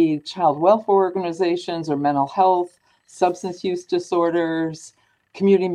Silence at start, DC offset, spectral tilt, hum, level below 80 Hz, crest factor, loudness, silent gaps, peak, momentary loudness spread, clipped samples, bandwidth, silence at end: 0 s; under 0.1%; -6.5 dB/octave; none; -68 dBFS; 16 dB; -21 LUFS; none; -4 dBFS; 9 LU; under 0.1%; 10.5 kHz; 0 s